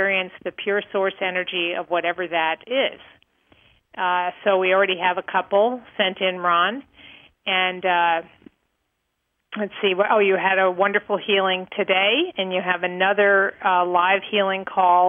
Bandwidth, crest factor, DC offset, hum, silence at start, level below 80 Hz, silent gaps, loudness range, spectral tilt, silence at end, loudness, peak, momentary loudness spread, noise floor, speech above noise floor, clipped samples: 3.7 kHz; 18 dB; under 0.1%; none; 0 s; -72 dBFS; none; 5 LU; -7.5 dB/octave; 0 s; -21 LUFS; -4 dBFS; 7 LU; -75 dBFS; 54 dB; under 0.1%